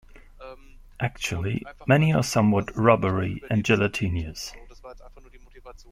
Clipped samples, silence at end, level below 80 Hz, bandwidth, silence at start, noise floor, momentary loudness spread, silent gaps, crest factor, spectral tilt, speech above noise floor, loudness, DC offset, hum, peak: under 0.1%; 0.15 s; -46 dBFS; 16 kHz; 0.15 s; -48 dBFS; 16 LU; none; 22 dB; -6 dB/octave; 25 dB; -24 LUFS; under 0.1%; none; -4 dBFS